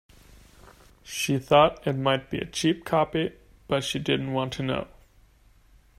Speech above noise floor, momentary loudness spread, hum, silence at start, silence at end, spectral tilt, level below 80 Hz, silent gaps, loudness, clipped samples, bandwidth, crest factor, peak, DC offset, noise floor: 33 dB; 12 LU; none; 1.05 s; 1.15 s; -5 dB/octave; -54 dBFS; none; -26 LUFS; under 0.1%; 16 kHz; 20 dB; -6 dBFS; under 0.1%; -58 dBFS